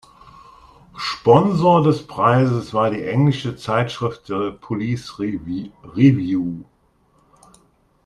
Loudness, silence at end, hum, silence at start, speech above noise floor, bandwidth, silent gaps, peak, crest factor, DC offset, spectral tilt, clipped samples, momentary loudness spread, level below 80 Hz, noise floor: -19 LUFS; 1.45 s; none; 0.95 s; 41 dB; 11 kHz; none; 0 dBFS; 20 dB; under 0.1%; -7.5 dB/octave; under 0.1%; 13 LU; -52 dBFS; -59 dBFS